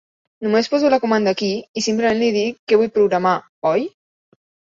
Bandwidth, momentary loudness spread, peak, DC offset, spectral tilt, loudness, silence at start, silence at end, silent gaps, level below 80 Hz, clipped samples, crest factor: 7.8 kHz; 6 LU; -2 dBFS; under 0.1%; -4.5 dB/octave; -18 LUFS; 0.4 s; 0.9 s; 1.69-1.74 s, 2.59-2.67 s, 3.49-3.62 s; -62 dBFS; under 0.1%; 16 dB